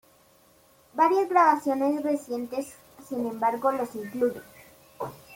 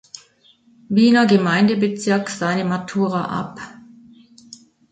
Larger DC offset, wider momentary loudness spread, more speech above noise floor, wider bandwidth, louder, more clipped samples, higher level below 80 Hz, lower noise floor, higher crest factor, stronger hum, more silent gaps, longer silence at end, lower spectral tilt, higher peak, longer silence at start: neither; second, 18 LU vs 22 LU; about the same, 34 dB vs 37 dB; first, 17 kHz vs 9.2 kHz; second, -26 LUFS vs -18 LUFS; neither; second, -70 dBFS vs -62 dBFS; first, -59 dBFS vs -55 dBFS; about the same, 20 dB vs 18 dB; neither; neither; second, 0 s vs 1.2 s; about the same, -5.5 dB/octave vs -6 dB/octave; second, -8 dBFS vs -2 dBFS; about the same, 0.95 s vs 0.9 s